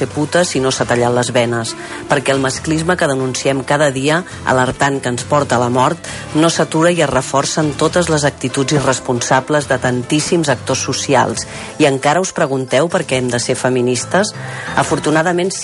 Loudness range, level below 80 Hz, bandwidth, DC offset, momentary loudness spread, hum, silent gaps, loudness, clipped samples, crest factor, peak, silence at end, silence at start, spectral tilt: 1 LU; -44 dBFS; 11.5 kHz; under 0.1%; 4 LU; none; none; -15 LUFS; under 0.1%; 14 dB; 0 dBFS; 0 s; 0 s; -4.5 dB/octave